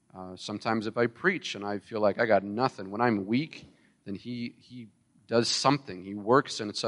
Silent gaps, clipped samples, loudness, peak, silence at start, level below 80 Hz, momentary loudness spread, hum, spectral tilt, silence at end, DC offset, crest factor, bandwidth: none; under 0.1%; -28 LUFS; -8 dBFS; 0.15 s; -72 dBFS; 17 LU; none; -4.5 dB/octave; 0 s; under 0.1%; 22 dB; 11.5 kHz